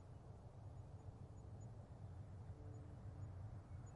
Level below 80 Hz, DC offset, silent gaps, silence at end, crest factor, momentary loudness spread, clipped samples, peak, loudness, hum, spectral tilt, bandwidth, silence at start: -64 dBFS; under 0.1%; none; 0 s; 14 dB; 4 LU; under 0.1%; -42 dBFS; -57 LUFS; none; -8 dB/octave; 10.5 kHz; 0 s